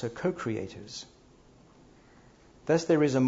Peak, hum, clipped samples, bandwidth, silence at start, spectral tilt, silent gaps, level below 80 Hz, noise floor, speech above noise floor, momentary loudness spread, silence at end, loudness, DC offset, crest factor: -12 dBFS; none; under 0.1%; 7.8 kHz; 0 s; -6 dB/octave; none; -62 dBFS; -57 dBFS; 29 dB; 18 LU; 0 s; -30 LUFS; under 0.1%; 18 dB